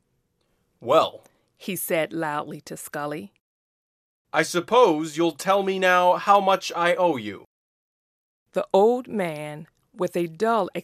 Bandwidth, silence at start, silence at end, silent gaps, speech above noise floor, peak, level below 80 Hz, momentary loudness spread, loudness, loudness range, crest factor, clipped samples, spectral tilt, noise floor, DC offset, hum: 15 kHz; 0.8 s; 0 s; 3.41-4.25 s, 7.46-8.46 s; 49 dB; -4 dBFS; -74 dBFS; 18 LU; -22 LUFS; 7 LU; 20 dB; under 0.1%; -4.5 dB/octave; -71 dBFS; under 0.1%; none